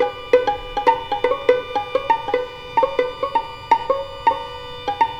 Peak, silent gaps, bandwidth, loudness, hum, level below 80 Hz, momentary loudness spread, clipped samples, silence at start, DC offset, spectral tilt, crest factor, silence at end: -2 dBFS; none; 9.4 kHz; -21 LUFS; none; -46 dBFS; 6 LU; under 0.1%; 0 s; under 0.1%; -4.5 dB/octave; 18 dB; 0 s